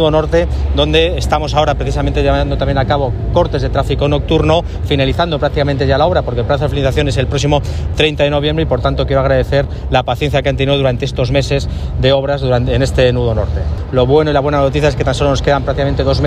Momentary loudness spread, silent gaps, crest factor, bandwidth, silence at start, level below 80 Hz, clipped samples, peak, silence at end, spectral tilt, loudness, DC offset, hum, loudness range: 4 LU; none; 12 dB; 12 kHz; 0 s; -22 dBFS; under 0.1%; 0 dBFS; 0 s; -6.5 dB/octave; -14 LUFS; under 0.1%; none; 1 LU